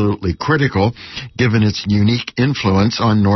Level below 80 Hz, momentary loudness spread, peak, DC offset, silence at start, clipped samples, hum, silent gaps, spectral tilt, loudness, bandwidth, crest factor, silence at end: -40 dBFS; 5 LU; -2 dBFS; under 0.1%; 0 s; under 0.1%; none; none; -6.5 dB/octave; -16 LUFS; 6.2 kHz; 12 dB; 0 s